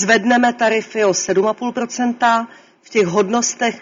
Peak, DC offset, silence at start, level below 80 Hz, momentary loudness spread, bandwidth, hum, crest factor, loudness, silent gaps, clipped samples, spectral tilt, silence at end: -2 dBFS; under 0.1%; 0 s; -62 dBFS; 7 LU; 7.6 kHz; none; 16 dB; -17 LUFS; none; under 0.1%; -3.5 dB/octave; 0 s